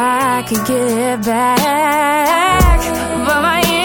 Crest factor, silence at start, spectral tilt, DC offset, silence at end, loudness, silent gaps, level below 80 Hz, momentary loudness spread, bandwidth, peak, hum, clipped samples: 14 dB; 0 s; -4 dB/octave; under 0.1%; 0 s; -14 LUFS; none; -22 dBFS; 5 LU; 17.5 kHz; 0 dBFS; none; under 0.1%